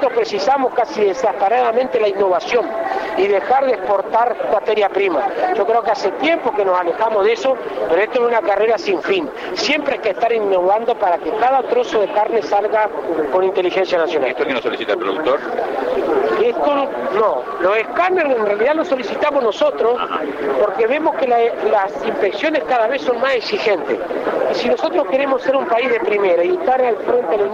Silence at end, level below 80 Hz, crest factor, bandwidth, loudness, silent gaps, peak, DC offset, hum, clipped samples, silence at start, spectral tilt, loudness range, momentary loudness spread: 0 s; -56 dBFS; 12 dB; 7.8 kHz; -17 LUFS; none; -4 dBFS; under 0.1%; none; under 0.1%; 0 s; -4.5 dB/octave; 1 LU; 4 LU